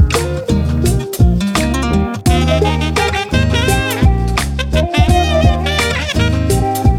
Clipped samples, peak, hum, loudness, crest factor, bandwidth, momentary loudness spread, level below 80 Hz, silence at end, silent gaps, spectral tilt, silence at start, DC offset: under 0.1%; 0 dBFS; none; -14 LUFS; 12 dB; 16.5 kHz; 4 LU; -18 dBFS; 0 s; none; -5.5 dB/octave; 0 s; under 0.1%